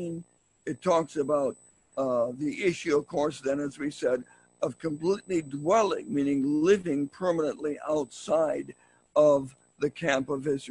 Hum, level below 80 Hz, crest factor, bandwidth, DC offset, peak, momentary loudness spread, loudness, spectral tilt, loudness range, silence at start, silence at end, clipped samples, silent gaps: none; -66 dBFS; 18 dB; 11 kHz; under 0.1%; -10 dBFS; 10 LU; -28 LUFS; -5.5 dB/octave; 3 LU; 0 s; 0 s; under 0.1%; none